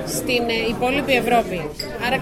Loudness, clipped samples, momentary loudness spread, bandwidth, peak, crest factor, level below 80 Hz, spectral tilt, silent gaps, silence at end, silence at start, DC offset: -20 LUFS; under 0.1%; 9 LU; 16.5 kHz; -4 dBFS; 16 dB; -42 dBFS; -4 dB/octave; none; 0 s; 0 s; under 0.1%